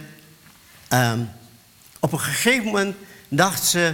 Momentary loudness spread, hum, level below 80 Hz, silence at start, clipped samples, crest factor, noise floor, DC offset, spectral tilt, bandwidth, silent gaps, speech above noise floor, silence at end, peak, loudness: 10 LU; none; -60 dBFS; 0 s; under 0.1%; 22 dB; -50 dBFS; under 0.1%; -3.5 dB/octave; 17.5 kHz; none; 30 dB; 0 s; 0 dBFS; -21 LUFS